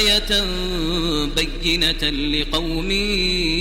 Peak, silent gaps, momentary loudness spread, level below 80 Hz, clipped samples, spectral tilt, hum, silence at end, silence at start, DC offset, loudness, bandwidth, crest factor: -4 dBFS; none; 5 LU; -28 dBFS; under 0.1%; -3.5 dB/octave; none; 0 s; 0 s; under 0.1%; -19 LUFS; 16.5 kHz; 16 dB